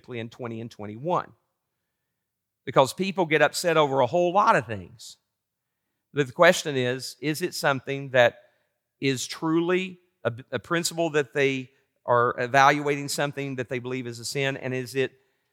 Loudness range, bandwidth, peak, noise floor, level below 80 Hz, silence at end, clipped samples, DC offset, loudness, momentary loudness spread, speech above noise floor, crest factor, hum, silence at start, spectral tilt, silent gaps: 3 LU; 17 kHz; -4 dBFS; -82 dBFS; -76 dBFS; 0.45 s; under 0.1%; under 0.1%; -24 LUFS; 16 LU; 58 dB; 22 dB; none; 0.1 s; -4.5 dB/octave; none